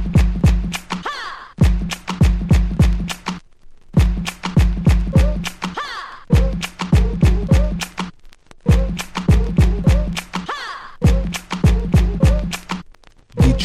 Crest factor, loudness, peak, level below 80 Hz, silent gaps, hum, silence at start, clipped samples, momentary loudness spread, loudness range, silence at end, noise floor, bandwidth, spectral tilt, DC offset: 14 dB; -19 LUFS; -2 dBFS; -20 dBFS; none; none; 0 s; under 0.1%; 12 LU; 2 LU; 0 s; -44 dBFS; 13.5 kHz; -6.5 dB/octave; under 0.1%